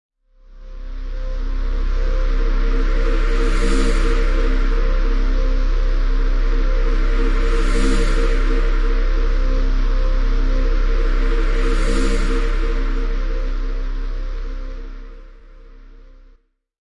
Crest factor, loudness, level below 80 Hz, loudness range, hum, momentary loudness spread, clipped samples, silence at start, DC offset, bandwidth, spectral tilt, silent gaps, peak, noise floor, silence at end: 12 dB; -22 LUFS; -16 dBFS; 7 LU; none; 10 LU; under 0.1%; 0.55 s; under 0.1%; 9.8 kHz; -6 dB/octave; none; -6 dBFS; -53 dBFS; 1.7 s